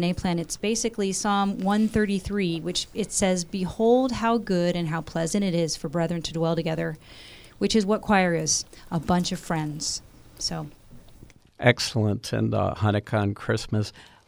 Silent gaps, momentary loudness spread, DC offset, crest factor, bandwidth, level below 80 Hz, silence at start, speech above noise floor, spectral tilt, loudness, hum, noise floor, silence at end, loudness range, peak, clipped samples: none; 9 LU; under 0.1%; 22 dB; over 20 kHz; -48 dBFS; 0 s; 25 dB; -4.5 dB/octave; -25 LUFS; none; -50 dBFS; 0.2 s; 3 LU; -4 dBFS; under 0.1%